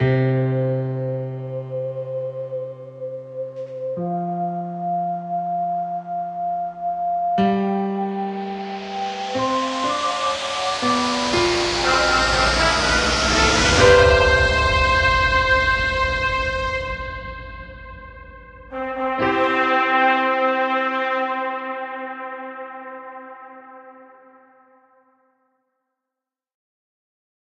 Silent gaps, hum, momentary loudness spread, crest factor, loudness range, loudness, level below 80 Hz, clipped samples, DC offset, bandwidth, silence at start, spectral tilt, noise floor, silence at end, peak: none; none; 17 LU; 20 dB; 13 LU; -20 LUFS; -36 dBFS; under 0.1%; under 0.1%; 11.5 kHz; 0 s; -4 dB/octave; -86 dBFS; 3.5 s; -2 dBFS